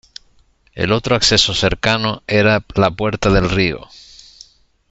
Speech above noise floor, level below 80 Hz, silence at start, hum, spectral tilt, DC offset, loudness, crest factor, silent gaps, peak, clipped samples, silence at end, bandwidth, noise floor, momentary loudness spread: 38 dB; -34 dBFS; 0.75 s; none; -4 dB/octave; under 0.1%; -15 LUFS; 18 dB; none; 0 dBFS; under 0.1%; 1.1 s; 8.2 kHz; -54 dBFS; 6 LU